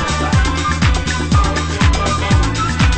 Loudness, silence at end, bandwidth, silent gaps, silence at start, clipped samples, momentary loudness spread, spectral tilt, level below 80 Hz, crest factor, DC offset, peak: -15 LUFS; 0 s; 8.8 kHz; none; 0 s; under 0.1%; 2 LU; -5 dB/octave; -18 dBFS; 14 dB; under 0.1%; 0 dBFS